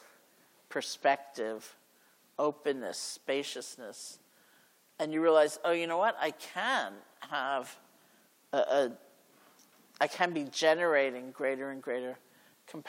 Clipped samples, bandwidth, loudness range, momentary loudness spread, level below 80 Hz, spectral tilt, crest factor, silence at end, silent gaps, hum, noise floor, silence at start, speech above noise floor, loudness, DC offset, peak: under 0.1%; 16.5 kHz; 6 LU; 17 LU; under -90 dBFS; -3 dB/octave; 22 dB; 0 s; none; none; -66 dBFS; 0.7 s; 34 dB; -32 LUFS; under 0.1%; -12 dBFS